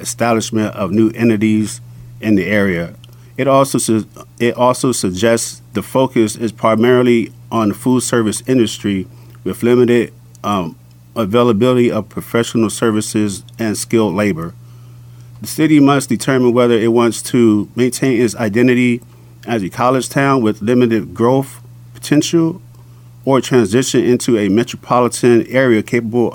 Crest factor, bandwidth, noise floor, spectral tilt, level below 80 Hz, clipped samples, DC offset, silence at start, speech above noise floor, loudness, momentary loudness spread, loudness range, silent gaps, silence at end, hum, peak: 14 dB; 19 kHz; -39 dBFS; -5.5 dB/octave; -52 dBFS; under 0.1%; under 0.1%; 0 s; 25 dB; -14 LUFS; 10 LU; 3 LU; none; 0 s; none; 0 dBFS